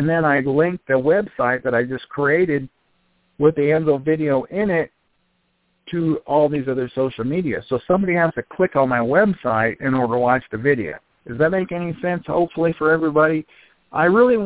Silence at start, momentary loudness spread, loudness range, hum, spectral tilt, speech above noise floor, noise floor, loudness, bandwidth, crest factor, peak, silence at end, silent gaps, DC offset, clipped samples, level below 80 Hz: 0 s; 7 LU; 3 LU; none; -11 dB/octave; 48 dB; -67 dBFS; -19 LUFS; 4 kHz; 16 dB; -2 dBFS; 0 s; none; under 0.1%; under 0.1%; -54 dBFS